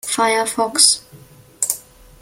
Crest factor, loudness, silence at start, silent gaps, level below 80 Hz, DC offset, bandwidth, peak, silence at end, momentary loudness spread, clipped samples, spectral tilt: 20 dB; -16 LUFS; 0.05 s; none; -56 dBFS; under 0.1%; 17 kHz; 0 dBFS; 0.4 s; 10 LU; under 0.1%; 0 dB/octave